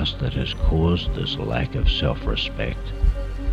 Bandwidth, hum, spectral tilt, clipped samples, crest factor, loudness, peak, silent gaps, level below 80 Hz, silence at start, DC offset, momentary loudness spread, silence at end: 7.2 kHz; none; -7 dB/octave; under 0.1%; 14 dB; -24 LUFS; -8 dBFS; none; -24 dBFS; 0 s; under 0.1%; 5 LU; 0 s